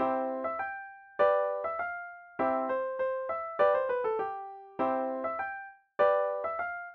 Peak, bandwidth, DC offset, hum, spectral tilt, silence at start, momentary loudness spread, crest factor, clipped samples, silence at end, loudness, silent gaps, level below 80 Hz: -14 dBFS; 4.4 kHz; under 0.1%; none; -7 dB/octave; 0 s; 15 LU; 18 dB; under 0.1%; 0 s; -31 LUFS; none; -72 dBFS